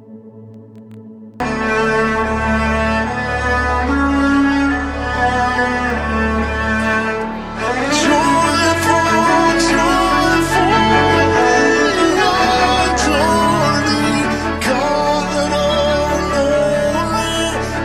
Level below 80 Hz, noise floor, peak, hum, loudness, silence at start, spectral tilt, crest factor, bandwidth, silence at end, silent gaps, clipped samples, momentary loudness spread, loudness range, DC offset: -30 dBFS; -37 dBFS; 0 dBFS; none; -15 LUFS; 0.1 s; -4.5 dB/octave; 14 dB; 15 kHz; 0 s; none; under 0.1%; 6 LU; 4 LU; under 0.1%